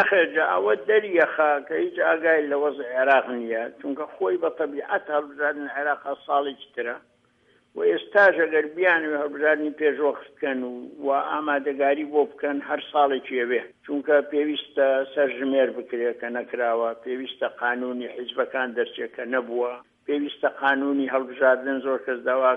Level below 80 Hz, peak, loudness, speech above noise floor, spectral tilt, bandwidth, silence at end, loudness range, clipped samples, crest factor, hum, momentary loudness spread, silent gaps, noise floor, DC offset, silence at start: -78 dBFS; -6 dBFS; -24 LUFS; 39 dB; -6 dB/octave; 5.4 kHz; 0 s; 5 LU; under 0.1%; 18 dB; none; 10 LU; none; -62 dBFS; under 0.1%; 0 s